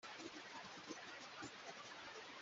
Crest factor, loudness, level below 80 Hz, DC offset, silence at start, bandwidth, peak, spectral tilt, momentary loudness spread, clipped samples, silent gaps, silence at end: 18 dB; -53 LUFS; -88 dBFS; under 0.1%; 0 s; 8 kHz; -38 dBFS; -1 dB/octave; 1 LU; under 0.1%; none; 0 s